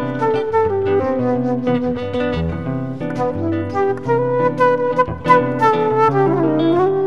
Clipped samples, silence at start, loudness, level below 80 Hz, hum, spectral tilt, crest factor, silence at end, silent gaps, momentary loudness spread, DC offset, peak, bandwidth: under 0.1%; 0 s; -17 LUFS; -44 dBFS; none; -8 dB/octave; 16 dB; 0 s; none; 7 LU; 1%; 0 dBFS; 10.5 kHz